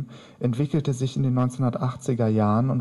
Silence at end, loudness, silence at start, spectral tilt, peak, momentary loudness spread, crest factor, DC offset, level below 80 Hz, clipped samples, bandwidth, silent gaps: 0 s; -24 LUFS; 0 s; -8 dB/octave; -10 dBFS; 6 LU; 12 dB; under 0.1%; -56 dBFS; under 0.1%; 11.5 kHz; none